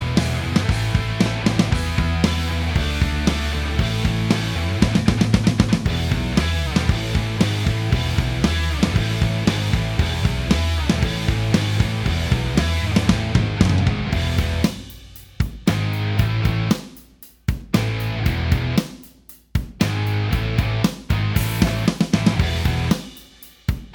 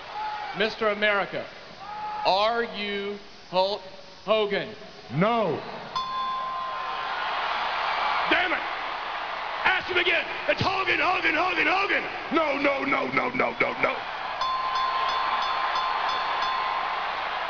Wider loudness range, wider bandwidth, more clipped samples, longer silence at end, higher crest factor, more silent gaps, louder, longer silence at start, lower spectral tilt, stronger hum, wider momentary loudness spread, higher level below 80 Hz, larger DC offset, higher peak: about the same, 3 LU vs 4 LU; first, 20 kHz vs 5.4 kHz; neither; about the same, 0 s vs 0 s; about the same, 20 dB vs 18 dB; neither; first, -21 LUFS vs -26 LUFS; about the same, 0 s vs 0 s; first, -6 dB/octave vs -4.5 dB/octave; neither; second, 5 LU vs 10 LU; first, -28 dBFS vs -58 dBFS; second, under 0.1% vs 0.2%; first, 0 dBFS vs -8 dBFS